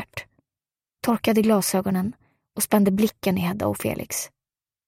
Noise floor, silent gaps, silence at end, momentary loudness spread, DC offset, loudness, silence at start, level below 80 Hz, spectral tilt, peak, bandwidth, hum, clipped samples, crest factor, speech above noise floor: under -90 dBFS; none; 0.6 s; 14 LU; under 0.1%; -23 LUFS; 0 s; -56 dBFS; -5 dB/octave; -6 dBFS; 16 kHz; none; under 0.1%; 18 dB; over 68 dB